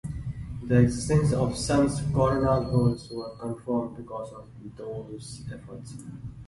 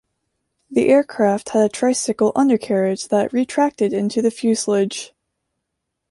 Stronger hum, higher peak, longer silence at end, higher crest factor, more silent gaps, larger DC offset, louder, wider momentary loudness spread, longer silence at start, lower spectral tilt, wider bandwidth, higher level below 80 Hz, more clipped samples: neither; about the same, -6 dBFS vs -4 dBFS; second, 0 s vs 1.05 s; about the same, 20 dB vs 16 dB; neither; neither; second, -26 LUFS vs -18 LUFS; first, 18 LU vs 5 LU; second, 0.05 s vs 0.7 s; first, -7 dB/octave vs -5 dB/octave; about the same, 11.5 kHz vs 11.5 kHz; first, -44 dBFS vs -62 dBFS; neither